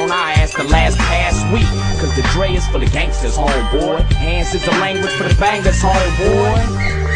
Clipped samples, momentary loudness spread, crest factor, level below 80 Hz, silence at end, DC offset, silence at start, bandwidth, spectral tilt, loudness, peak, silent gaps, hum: under 0.1%; 4 LU; 14 dB; -18 dBFS; 0 s; 0.2%; 0 s; 10 kHz; -5 dB/octave; -15 LUFS; 0 dBFS; none; none